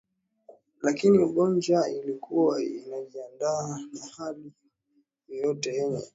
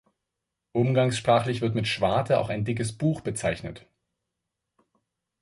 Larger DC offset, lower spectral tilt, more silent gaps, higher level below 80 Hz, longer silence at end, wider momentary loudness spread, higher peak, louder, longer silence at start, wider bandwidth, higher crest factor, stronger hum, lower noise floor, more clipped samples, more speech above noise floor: neither; about the same, -6 dB/octave vs -6 dB/octave; neither; second, -72 dBFS vs -54 dBFS; second, 0.1 s vs 1.65 s; first, 17 LU vs 7 LU; about the same, -10 dBFS vs -8 dBFS; about the same, -27 LUFS vs -26 LUFS; second, 0.5 s vs 0.75 s; second, 8 kHz vs 11.5 kHz; about the same, 18 dB vs 20 dB; neither; second, -71 dBFS vs -84 dBFS; neither; second, 44 dB vs 59 dB